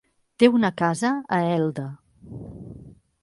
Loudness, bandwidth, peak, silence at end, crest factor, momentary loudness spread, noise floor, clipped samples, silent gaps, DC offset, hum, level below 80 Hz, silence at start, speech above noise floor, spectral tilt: -22 LUFS; 11.5 kHz; -4 dBFS; 0.35 s; 20 dB; 22 LU; -46 dBFS; under 0.1%; none; under 0.1%; none; -56 dBFS; 0.4 s; 25 dB; -6 dB/octave